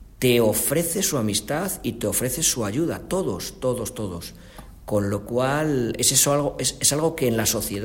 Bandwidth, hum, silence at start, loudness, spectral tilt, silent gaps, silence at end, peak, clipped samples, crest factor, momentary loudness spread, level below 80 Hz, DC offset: 16.5 kHz; none; 0 s; -22 LUFS; -3.5 dB/octave; none; 0 s; -4 dBFS; under 0.1%; 20 dB; 10 LU; -46 dBFS; under 0.1%